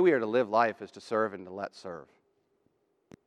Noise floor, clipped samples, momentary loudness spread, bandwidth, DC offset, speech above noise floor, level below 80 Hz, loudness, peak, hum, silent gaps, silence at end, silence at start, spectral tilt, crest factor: -73 dBFS; under 0.1%; 18 LU; 10 kHz; under 0.1%; 44 dB; -84 dBFS; -30 LUFS; -12 dBFS; none; none; 1.2 s; 0 s; -6.5 dB/octave; 18 dB